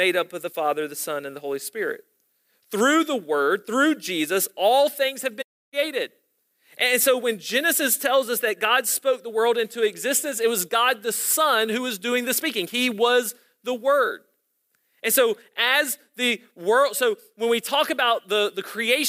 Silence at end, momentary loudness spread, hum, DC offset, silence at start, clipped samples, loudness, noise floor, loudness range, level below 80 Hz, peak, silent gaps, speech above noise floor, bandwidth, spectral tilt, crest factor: 0 s; 10 LU; none; under 0.1%; 0 s; under 0.1%; -22 LUFS; -71 dBFS; 3 LU; -80 dBFS; -6 dBFS; 5.44-5.72 s; 49 dB; 16 kHz; -1.5 dB/octave; 18 dB